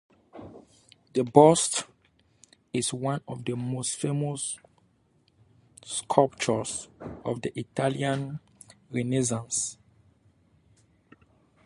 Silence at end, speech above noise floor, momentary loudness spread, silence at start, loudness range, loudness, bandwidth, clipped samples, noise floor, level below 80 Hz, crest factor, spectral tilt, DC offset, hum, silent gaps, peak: 1.9 s; 40 dB; 18 LU; 0.35 s; 7 LU; -27 LUFS; 11.5 kHz; under 0.1%; -66 dBFS; -64 dBFS; 26 dB; -4.5 dB/octave; under 0.1%; none; none; -2 dBFS